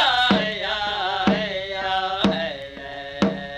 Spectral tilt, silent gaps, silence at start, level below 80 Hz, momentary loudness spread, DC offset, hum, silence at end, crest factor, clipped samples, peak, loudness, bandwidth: -5 dB/octave; none; 0 s; -48 dBFS; 14 LU; under 0.1%; none; 0 s; 20 dB; under 0.1%; -4 dBFS; -22 LUFS; 9.8 kHz